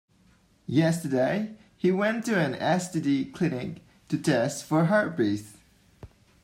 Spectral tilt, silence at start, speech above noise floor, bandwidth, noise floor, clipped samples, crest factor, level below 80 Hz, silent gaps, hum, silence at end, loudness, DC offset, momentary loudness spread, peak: -6 dB/octave; 0.7 s; 36 dB; 16 kHz; -61 dBFS; under 0.1%; 16 dB; -64 dBFS; none; none; 0.35 s; -26 LUFS; under 0.1%; 11 LU; -10 dBFS